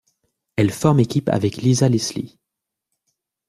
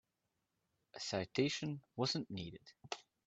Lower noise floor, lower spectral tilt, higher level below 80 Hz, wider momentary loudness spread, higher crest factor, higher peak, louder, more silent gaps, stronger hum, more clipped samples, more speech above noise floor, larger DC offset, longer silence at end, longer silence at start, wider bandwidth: second, -83 dBFS vs -87 dBFS; first, -6 dB/octave vs -4.5 dB/octave; first, -54 dBFS vs -76 dBFS; about the same, 13 LU vs 14 LU; about the same, 18 dB vs 22 dB; first, -2 dBFS vs -20 dBFS; first, -19 LUFS vs -41 LUFS; neither; neither; neither; first, 65 dB vs 46 dB; neither; first, 1.2 s vs 0.25 s; second, 0.55 s vs 0.95 s; first, 14.5 kHz vs 8.4 kHz